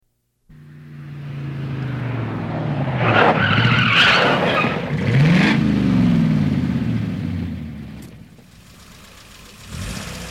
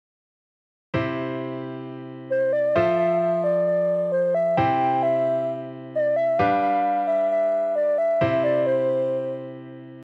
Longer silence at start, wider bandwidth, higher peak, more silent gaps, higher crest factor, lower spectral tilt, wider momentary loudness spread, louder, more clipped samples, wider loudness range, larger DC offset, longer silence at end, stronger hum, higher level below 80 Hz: second, 0.5 s vs 0.95 s; first, 15 kHz vs 7 kHz; first, -2 dBFS vs -8 dBFS; neither; about the same, 16 dB vs 14 dB; second, -6 dB/octave vs -8.5 dB/octave; first, 18 LU vs 12 LU; first, -17 LUFS vs -23 LUFS; neither; first, 12 LU vs 2 LU; neither; about the same, 0 s vs 0 s; neither; first, -42 dBFS vs -60 dBFS